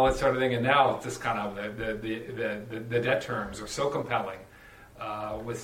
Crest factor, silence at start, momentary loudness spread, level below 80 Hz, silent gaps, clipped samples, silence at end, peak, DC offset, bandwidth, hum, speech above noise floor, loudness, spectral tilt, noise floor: 22 dB; 0 s; 12 LU; -48 dBFS; none; under 0.1%; 0 s; -8 dBFS; under 0.1%; 16 kHz; none; 23 dB; -29 LUFS; -5 dB/octave; -51 dBFS